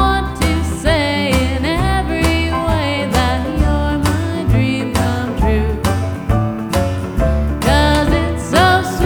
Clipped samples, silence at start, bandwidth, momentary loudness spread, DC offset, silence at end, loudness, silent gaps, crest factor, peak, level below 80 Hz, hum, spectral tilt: under 0.1%; 0 s; 20 kHz; 5 LU; under 0.1%; 0 s; -16 LUFS; none; 14 dB; 0 dBFS; -22 dBFS; none; -5.5 dB/octave